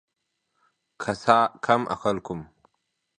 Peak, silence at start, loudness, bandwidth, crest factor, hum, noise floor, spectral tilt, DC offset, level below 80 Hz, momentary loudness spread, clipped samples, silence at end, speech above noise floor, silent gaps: -2 dBFS; 1 s; -24 LUFS; 10 kHz; 26 dB; none; -78 dBFS; -5.5 dB/octave; under 0.1%; -60 dBFS; 15 LU; under 0.1%; 0.75 s; 55 dB; none